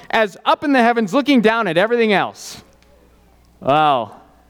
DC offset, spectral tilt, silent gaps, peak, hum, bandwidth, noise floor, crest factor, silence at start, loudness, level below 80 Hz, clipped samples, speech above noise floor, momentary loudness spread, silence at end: under 0.1%; -5 dB/octave; none; -2 dBFS; none; 17 kHz; -51 dBFS; 16 dB; 0.15 s; -16 LUFS; -56 dBFS; under 0.1%; 35 dB; 11 LU; 0.35 s